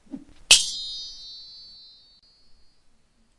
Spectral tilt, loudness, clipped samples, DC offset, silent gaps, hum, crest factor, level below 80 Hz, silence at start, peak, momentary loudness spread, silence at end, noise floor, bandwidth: 2 dB/octave; -19 LUFS; under 0.1%; under 0.1%; none; none; 28 dB; -54 dBFS; 0.1 s; 0 dBFS; 27 LU; 1.75 s; -60 dBFS; 12 kHz